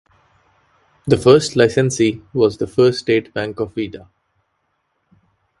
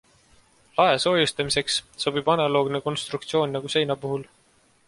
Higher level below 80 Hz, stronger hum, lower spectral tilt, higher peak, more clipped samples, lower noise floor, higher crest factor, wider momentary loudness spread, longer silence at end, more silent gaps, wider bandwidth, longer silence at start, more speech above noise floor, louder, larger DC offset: first, -50 dBFS vs -60 dBFS; neither; first, -5.5 dB/octave vs -4 dB/octave; first, 0 dBFS vs -6 dBFS; neither; first, -69 dBFS vs -61 dBFS; about the same, 18 dB vs 20 dB; first, 14 LU vs 9 LU; first, 1.6 s vs 0.65 s; neither; about the same, 11.5 kHz vs 11.5 kHz; first, 1.05 s vs 0.75 s; first, 53 dB vs 38 dB; first, -17 LUFS vs -24 LUFS; neither